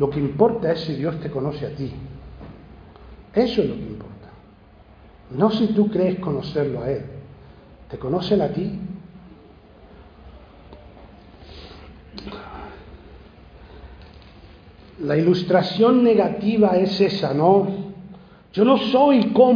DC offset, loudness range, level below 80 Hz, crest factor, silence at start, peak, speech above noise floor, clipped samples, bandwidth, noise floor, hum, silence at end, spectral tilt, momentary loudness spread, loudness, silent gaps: under 0.1%; 22 LU; -48 dBFS; 20 dB; 0 s; -2 dBFS; 30 dB; under 0.1%; 5.2 kHz; -48 dBFS; none; 0 s; -8.5 dB/octave; 24 LU; -20 LUFS; none